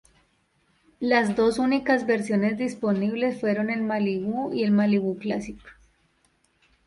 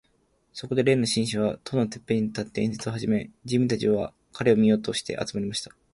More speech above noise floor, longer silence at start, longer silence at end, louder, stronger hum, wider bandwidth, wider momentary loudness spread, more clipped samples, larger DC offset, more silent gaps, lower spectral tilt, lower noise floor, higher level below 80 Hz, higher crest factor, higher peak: about the same, 43 dB vs 42 dB; first, 1 s vs 0.55 s; first, 1.15 s vs 0.3 s; about the same, -24 LUFS vs -26 LUFS; neither; about the same, 11.5 kHz vs 11.5 kHz; about the same, 8 LU vs 9 LU; neither; neither; neither; about the same, -6.5 dB/octave vs -5.5 dB/octave; about the same, -67 dBFS vs -67 dBFS; about the same, -60 dBFS vs -58 dBFS; about the same, 18 dB vs 18 dB; about the same, -6 dBFS vs -6 dBFS